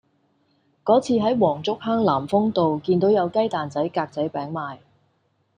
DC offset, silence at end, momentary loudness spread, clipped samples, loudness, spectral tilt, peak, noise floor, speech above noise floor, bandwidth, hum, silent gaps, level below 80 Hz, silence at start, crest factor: under 0.1%; 0.85 s; 10 LU; under 0.1%; -22 LUFS; -7 dB/octave; -4 dBFS; -67 dBFS; 46 dB; 10 kHz; none; none; -64 dBFS; 0.85 s; 18 dB